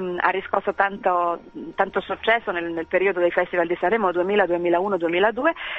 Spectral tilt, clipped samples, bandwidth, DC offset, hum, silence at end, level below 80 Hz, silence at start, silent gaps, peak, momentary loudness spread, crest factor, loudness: -7 dB/octave; under 0.1%; 7.4 kHz; under 0.1%; none; 0 s; -56 dBFS; 0 s; none; -2 dBFS; 5 LU; 20 dB; -22 LUFS